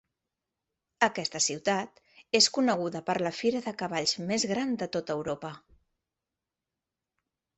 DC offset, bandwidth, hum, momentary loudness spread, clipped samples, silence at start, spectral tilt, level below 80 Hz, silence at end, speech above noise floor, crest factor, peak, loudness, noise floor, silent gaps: under 0.1%; 8.6 kHz; none; 10 LU; under 0.1%; 1 s; -2.5 dB/octave; -70 dBFS; 2 s; 60 dB; 24 dB; -8 dBFS; -28 LUFS; -89 dBFS; none